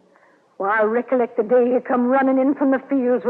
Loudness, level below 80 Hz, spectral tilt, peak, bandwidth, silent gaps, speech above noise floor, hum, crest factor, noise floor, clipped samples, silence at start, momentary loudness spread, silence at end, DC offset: -19 LUFS; -72 dBFS; -9 dB/octave; -8 dBFS; 3.9 kHz; none; 37 dB; none; 12 dB; -55 dBFS; under 0.1%; 0.6 s; 4 LU; 0 s; under 0.1%